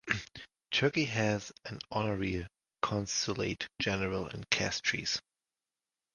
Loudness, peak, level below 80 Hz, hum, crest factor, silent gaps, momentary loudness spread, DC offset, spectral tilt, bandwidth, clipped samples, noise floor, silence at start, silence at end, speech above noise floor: -33 LUFS; -10 dBFS; -56 dBFS; none; 24 dB; none; 10 LU; under 0.1%; -3.5 dB/octave; 11 kHz; under 0.1%; under -90 dBFS; 0.05 s; 0.95 s; over 56 dB